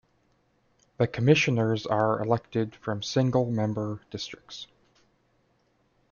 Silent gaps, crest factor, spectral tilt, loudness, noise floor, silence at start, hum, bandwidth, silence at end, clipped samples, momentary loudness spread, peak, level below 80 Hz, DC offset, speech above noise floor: none; 22 dB; -6 dB/octave; -27 LUFS; -69 dBFS; 1 s; none; 7.2 kHz; 1.45 s; under 0.1%; 16 LU; -6 dBFS; -62 dBFS; under 0.1%; 42 dB